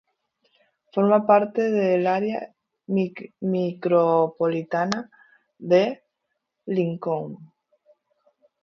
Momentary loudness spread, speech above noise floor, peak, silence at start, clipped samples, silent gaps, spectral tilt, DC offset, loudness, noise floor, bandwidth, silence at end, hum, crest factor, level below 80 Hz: 18 LU; 57 dB; -4 dBFS; 0.95 s; under 0.1%; none; -7.5 dB/octave; under 0.1%; -23 LUFS; -79 dBFS; 7.2 kHz; 1.2 s; none; 20 dB; -72 dBFS